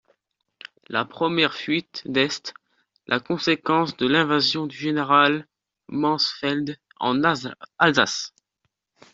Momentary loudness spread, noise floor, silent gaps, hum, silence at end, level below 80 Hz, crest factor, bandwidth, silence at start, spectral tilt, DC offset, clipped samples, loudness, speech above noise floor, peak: 11 LU; -76 dBFS; none; none; 0.85 s; -66 dBFS; 22 dB; 7.8 kHz; 0.9 s; -4 dB/octave; under 0.1%; under 0.1%; -22 LUFS; 54 dB; -2 dBFS